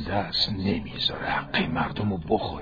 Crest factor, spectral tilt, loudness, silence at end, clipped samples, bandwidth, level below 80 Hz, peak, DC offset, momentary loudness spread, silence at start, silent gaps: 18 dB; -6.5 dB/octave; -26 LUFS; 0 s; under 0.1%; 5 kHz; -46 dBFS; -10 dBFS; under 0.1%; 4 LU; 0 s; none